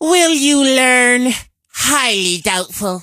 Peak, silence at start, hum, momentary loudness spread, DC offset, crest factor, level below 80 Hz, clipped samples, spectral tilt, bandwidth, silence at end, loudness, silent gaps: 0 dBFS; 0 s; none; 10 LU; under 0.1%; 14 dB; -48 dBFS; under 0.1%; -1.5 dB/octave; 15.5 kHz; 0 s; -12 LUFS; none